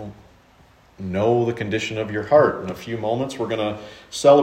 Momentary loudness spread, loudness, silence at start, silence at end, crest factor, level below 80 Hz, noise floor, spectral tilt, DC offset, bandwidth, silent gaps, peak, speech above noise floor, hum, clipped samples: 15 LU; -21 LUFS; 0 s; 0 s; 20 dB; -56 dBFS; -53 dBFS; -5.5 dB/octave; under 0.1%; 13.5 kHz; none; -2 dBFS; 33 dB; none; under 0.1%